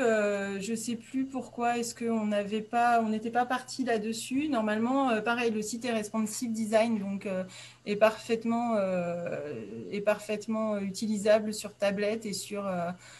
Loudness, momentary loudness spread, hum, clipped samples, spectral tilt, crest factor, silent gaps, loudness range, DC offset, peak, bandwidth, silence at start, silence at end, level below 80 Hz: -30 LUFS; 9 LU; none; under 0.1%; -4.5 dB/octave; 20 dB; none; 2 LU; under 0.1%; -10 dBFS; 13 kHz; 0 s; 0 s; -70 dBFS